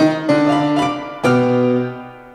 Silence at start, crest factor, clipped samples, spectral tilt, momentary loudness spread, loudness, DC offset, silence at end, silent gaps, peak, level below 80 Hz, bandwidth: 0 s; 14 dB; under 0.1%; -6.5 dB/octave; 7 LU; -16 LUFS; under 0.1%; 0.05 s; none; -2 dBFS; -54 dBFS; 11.5 kHz